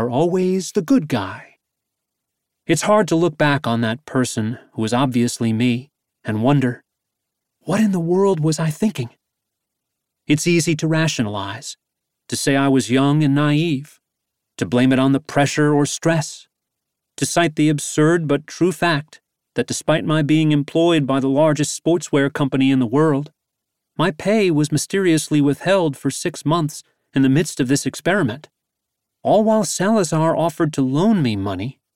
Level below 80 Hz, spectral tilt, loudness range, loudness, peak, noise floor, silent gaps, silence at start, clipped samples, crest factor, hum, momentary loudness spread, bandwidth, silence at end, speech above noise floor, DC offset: -56 dBFS; -5.5 dB/octave; 3 LU; -18 LUFS; -2 dBFS; -80 dBFS; none; 0 s; under 0.1%; 16 dB; none; 10 LU; 16 kHz; 0.25 s; 62 dB; under 0.1%